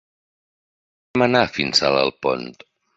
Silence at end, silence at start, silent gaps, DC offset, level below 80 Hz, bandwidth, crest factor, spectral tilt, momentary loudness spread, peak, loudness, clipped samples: 0.45 s; 1.15 s; none; under 0.1%; -54 dBFS; 8 kHz; 20 dB; -4 dB/octave; 10 LU; -2 dBFS; -19 LUFS; under 0.1%